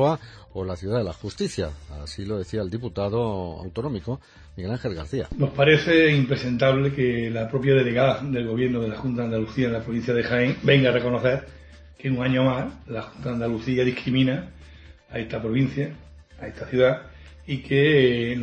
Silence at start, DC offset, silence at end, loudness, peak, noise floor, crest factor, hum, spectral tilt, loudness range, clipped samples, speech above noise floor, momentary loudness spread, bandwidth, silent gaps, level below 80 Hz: 0 s; under 0.1%; 0 s; -23 LUFS; -4 dBFS; -47 dBFS; 20 dB; none; -7 dB/octave; 8 LU; under 0.1%; 24 dB; 14 LU; 9.4 kHz; none; -46 dBFS